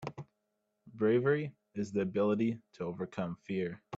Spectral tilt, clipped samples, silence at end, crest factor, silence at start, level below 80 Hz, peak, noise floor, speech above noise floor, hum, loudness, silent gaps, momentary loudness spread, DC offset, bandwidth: -8 dB/octave; under 0.1%; 0 s; 16 dB; 0 s; -74 dBFS; -18 dBFS; -82 dBFS; 49 dB; none; -34 LUFS; none; 12 LU; under 0.1%; 7.8 kHz